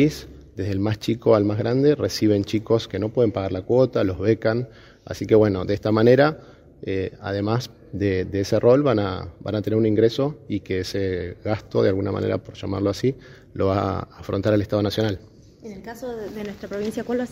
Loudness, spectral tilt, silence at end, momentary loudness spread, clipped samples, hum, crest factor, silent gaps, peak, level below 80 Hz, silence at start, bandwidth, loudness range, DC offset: -22 LUFS; -7 dB/octave; 0 s; 15 LU; under 0.1%; none; 20 dB; none; -2 dBFS; -50 dBFS; 0 s; 16 kHz; 4 LU; under 0.1%